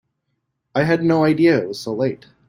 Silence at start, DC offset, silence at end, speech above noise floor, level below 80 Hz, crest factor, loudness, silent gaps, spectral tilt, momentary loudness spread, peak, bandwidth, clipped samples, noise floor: 0.75 s; under 0.1%; 0.3 s; 56 dB; -56 dBFS; 16 dB; -18 LUFS; none; -7 dB/octave; 10 LU; -4 dBFS; 15.5 kHz; under 0.1%; -74 dBFS